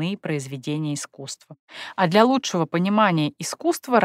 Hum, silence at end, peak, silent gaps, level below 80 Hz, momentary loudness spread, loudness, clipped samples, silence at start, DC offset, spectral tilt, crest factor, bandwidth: none; 0 s; -4 dBFS; 1.59-1.68 s; -72 dBFS; 18 LU; -22 LUFS; under 0.1%; 0 s; under 0.1%; -5 dB/octave; 18 dB; 16 kHz